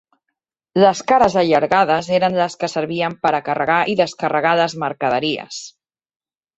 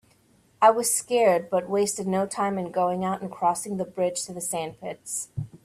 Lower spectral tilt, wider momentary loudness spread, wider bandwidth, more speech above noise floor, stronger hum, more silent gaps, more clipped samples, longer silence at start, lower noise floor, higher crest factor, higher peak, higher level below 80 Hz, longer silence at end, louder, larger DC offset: about the same, -5 dB/octave vs -4 dB/octave; second, 8 LU vs 11 LU; second, 8.2 kHz vs 16 kHz; first, 61 dB vs 36 dB; neither; neither; neither; first, 0.75 s vs 0.6 s; first, -78 dBFS vs -61 dBFS; about the same, 16 dB vs 20 dB; first, -2 dBFS vs -6 dBFS; first, -56 dBFS vs -64 dBFS; first, 0.9 s vs 0.1 s; first, -17 LUFS vs -25 LUFS; neither